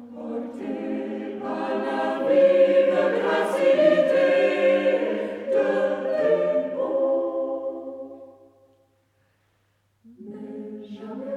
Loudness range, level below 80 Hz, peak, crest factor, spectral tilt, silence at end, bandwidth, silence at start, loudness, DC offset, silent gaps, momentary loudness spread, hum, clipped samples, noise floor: 18 LU; -72 dBFS; -8 dBFS; 16 dB; -6 dB/octave; 0 s; 10.5 kHz; 0 s; -22 LUFS; under 0.1%; none; 19 LU; none; under 0.1%; -68 dBFS